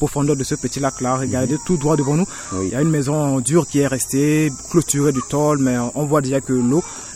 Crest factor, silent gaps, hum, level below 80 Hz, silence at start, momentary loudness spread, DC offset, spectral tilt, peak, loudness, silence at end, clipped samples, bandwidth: 16 dB; none; none; -44 dBFS; 0 s; 4 LU; under 0.1%; -5.5 dB/octave; -2 dBFS; -19 LUFS; 0 s; under 0.1%; 16 kHz